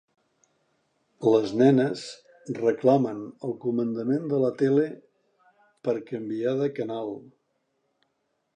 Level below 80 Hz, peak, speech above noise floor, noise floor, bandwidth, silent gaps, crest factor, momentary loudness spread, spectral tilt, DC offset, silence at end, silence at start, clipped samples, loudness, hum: -76 dBFS; -6 dBFS; 51 dB; -75 dBFS; 9.4 kHz; none; 20 dB; 16 LU; -7.5 dB/octave; under 0.1%; 1.35 s; 1.2 s; under 0.1%; -26 LUFS; none